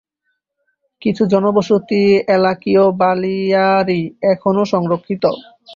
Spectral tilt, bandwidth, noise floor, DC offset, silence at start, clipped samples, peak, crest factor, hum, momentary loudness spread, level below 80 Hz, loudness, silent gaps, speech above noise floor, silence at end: -7.5 dB/octave; 7.4 kHz; -71 dBFS; under 0.1%; 1 s; under 0.1%; -2 dBFS; 14 dB; none; 6 LU; -58 dBFS; -15 LUFS; none; 57 dB; 0 s